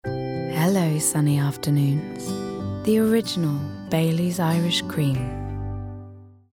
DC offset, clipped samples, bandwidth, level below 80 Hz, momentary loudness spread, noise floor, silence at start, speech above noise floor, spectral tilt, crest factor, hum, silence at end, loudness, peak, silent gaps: under 0.1%; under 0.1%; 19 kHz; -46 dBFS; 11 LU; -43 dBFS; 0.05 s; 22 dB; -5.5 dB/octave; 14 dB; 50 Hz at -45 dBFS; 0.25 s; -23 LUFS; -8 dBFS; none